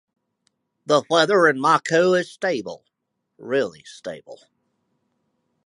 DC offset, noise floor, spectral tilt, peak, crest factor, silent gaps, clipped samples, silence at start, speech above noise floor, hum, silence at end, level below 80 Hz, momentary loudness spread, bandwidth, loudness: under 0.1%; -78 dBFS; -4.5 dB/octave; -4 dBFS; 20 dB; none; under 0.1%; 0.9 s; 57 dB; none; 1.3 s; -74 dBFS; 20 LU; 11.5 kHz; -20 LUFS